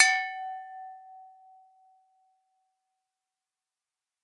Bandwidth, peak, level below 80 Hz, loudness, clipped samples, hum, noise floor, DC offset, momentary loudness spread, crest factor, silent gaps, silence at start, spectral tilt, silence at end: 11 kHz; -4 dBFS; under -90 dBFS; -29 LUFS; under 0.1%; none; under -90 dBFS; under 0.1%; 25 LU; 30 dB; none; 0 s; 9 dB/octave; 3 s